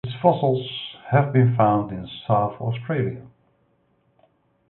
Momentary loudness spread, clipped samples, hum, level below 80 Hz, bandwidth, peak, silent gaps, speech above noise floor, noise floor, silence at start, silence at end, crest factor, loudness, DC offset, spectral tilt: 13 LU; under 0.1%; none; -56 dBFS; 4.2 kHz; -4 dBFS; none; 44 dB; -65 dBFS; 0.05 s; 1.45 s; 20 dB; -22 LUFS; under 0.1%; -12 dB/octave